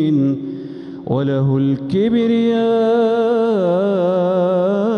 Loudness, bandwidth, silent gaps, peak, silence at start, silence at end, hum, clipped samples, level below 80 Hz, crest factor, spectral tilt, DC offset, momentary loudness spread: -16 LUFS; 6.6 kHz; none; -6 dBFS; 0 s; 0 s; none; under 0.1%; -56 dBFS; 10 dB; -9 dB/octave; under 0.1%; 8 LU